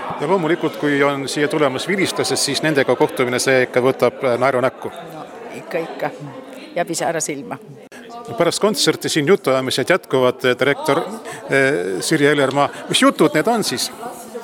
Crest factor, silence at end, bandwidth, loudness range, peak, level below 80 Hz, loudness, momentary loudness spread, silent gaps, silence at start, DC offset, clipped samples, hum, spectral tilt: 16 dB; 0 s; 17.5 kHz; 6 LU; -2 dBFS; -66 dBFS; -18 LUFS; 16 LU; none; 0 s; under 0.1%; under 0.1%; none; -4 dB/octave